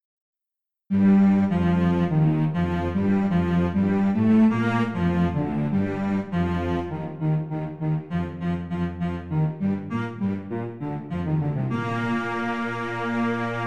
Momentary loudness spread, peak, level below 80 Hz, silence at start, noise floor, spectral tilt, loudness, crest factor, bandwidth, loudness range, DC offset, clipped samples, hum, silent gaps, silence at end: 10 LU; -10 dBFS; -48 dBFS; 0.9 s; -87 dBFS; -9 dB/octave; -24 LUFS; 14 dB; 7.4 kHz; 6 LU; 0.4%; under 0.1%; none; none; 0 s